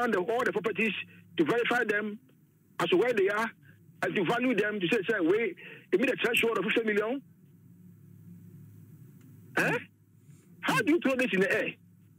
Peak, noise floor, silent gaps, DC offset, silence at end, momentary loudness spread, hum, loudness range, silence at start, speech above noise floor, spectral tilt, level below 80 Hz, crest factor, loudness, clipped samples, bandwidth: -14 dBFS; -57 dBFS; none; under 0.1%; 0.45 s; 9 LU; none; 7 LU; 0 s; 29 dB; -5 dB/octave; -78 dBFS; 16 dB; -29 LUFS; under 0.1%; 16 kHz